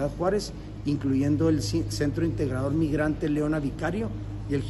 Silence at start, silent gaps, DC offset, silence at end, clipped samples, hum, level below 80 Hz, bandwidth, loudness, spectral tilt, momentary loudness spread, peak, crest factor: 0 s; none; under 0.1%; 0 s; under 0.1%; none; -40 dBFS; 12.5 kHz; -27 LUFS; -7 dB/octave; 7 LU; -12 dBFS; 14 dB